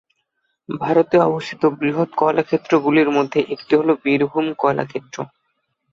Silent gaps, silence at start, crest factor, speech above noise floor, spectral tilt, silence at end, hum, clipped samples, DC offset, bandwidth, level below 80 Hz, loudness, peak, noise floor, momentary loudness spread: none; 0.7 s; 16 dB; 54 dB; -7 dB/octave; 0.65 s; none; under 0.1%; under 0.1%; 7.6 kHz; -62 dBFS; -18 LUFS; -2 dBFS; -71 dBFS; 12 LU